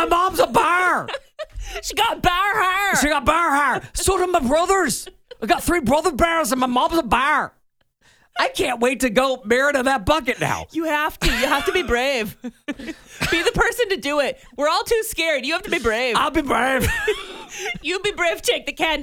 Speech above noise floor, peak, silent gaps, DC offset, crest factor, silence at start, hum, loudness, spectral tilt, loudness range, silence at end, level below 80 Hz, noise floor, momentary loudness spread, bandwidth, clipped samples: 40 dB; -4 dBFS; none; under 0.1%; 18 dB; 0 s; none; -20 LUFS; -3 dB/octave; 2 LU; 0 s; -38 dBFS; -60 dBFS; 12 LU; over 20 kHz; under 0.1%